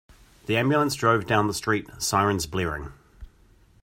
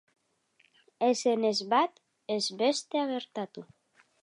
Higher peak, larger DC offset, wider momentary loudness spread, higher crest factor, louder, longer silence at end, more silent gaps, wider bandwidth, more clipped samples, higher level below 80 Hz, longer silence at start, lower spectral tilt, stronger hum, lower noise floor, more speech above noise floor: first, -6 dBFS vs -12 dBFS; neither; second, 10 LU vs 13 LU; about the same, 20 dB vs 18 dB; first, -24 LUFS vs -29 LUFS; about the same, 0.6 s vs 0.6 s; neither; first, 16 kHz vs 11 kHz; neither; first, -48 dBFS vs -86 dBFS; second, 0.5 s vs 1 s; about the same, -4.5 dB/octave vs -3.5 dB/octave; neither; second, -57 dBFS vs -69 dBFS; second, 33 dB vs 41 dB